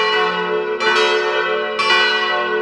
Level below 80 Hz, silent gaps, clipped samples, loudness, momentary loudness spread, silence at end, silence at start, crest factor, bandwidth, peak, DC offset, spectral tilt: -64 dBFS; none; under 0.1%; -16 LUFS; 6 LU; 0 s; 0 s; 14 dB; 11 kHz; -2 dBFS; under 0.1%; -2.5 dB/octave